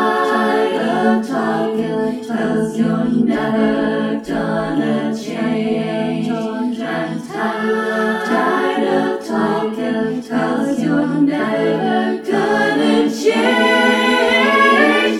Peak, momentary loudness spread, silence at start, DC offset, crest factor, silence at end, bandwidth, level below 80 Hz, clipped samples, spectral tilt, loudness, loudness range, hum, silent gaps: 0 dBFS; 8 LU; 0 s; under 0.1%; 16 dB; 0 s; 14 kHz; -54 dBFS; under 0.1%; -5.5 dB/octave; -16 LUFS; 5 LU; none; none